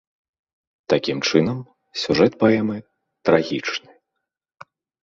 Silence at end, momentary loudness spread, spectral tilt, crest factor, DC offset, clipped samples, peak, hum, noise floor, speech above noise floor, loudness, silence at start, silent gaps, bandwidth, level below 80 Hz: 1.25 s; 14 LU; -5.5 dB/octave; 22 dB; under 0.1%; under 0.1%; 0 dBFS; none; -81 dBFS; 62 dB; -20 LUFS; 0.9 s; none; 7.8 kHz; -58 dBFS